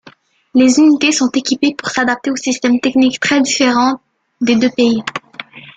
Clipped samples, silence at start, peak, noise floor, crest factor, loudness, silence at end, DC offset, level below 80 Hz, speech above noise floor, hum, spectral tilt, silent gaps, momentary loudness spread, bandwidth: under 0.1%; 0.55 s; -2 dBFS; -45 dBFS; 12 dB; -13 LUFS; 0.05 s; under 0.1%; -56 dBFS; 32 dB; none; -3 dB/octave; none; 10 LU; 9.4 kHz